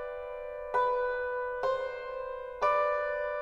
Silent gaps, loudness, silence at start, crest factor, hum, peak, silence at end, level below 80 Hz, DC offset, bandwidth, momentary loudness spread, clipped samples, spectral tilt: none; -32 LUFS; 0 s; 16 dB; none; -16 dBFS; 0 s; -58 dBFS; under 0.1%; 7.2 kHz; 11 LU; under 0.1%; -3.5 dB/octave